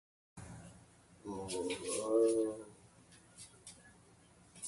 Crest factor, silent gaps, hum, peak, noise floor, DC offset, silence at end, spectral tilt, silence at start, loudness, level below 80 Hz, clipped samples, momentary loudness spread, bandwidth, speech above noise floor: 20 dB; none; none; -20 dBFS; -64 dBFS; under 0.1%; 0 s; -4 dB/octave; 0.35 s; -36 LUFS; -70 dBFS; under 0.1%; 27 LU; 11.5 kHz; 30 dB